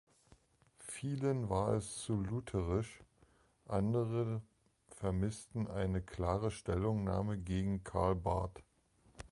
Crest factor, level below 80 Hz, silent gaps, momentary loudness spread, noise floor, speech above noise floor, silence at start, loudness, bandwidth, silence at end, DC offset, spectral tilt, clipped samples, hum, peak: 18 dB; -52 dBFS; none; 8 LU; -70 dBFS; 33 dB; 0.8 s; -38 LUFS; 11.5 kHz; 0.05 s; under 0.1%; -7 dB/octave; under 0.1%; none; -20 dBFS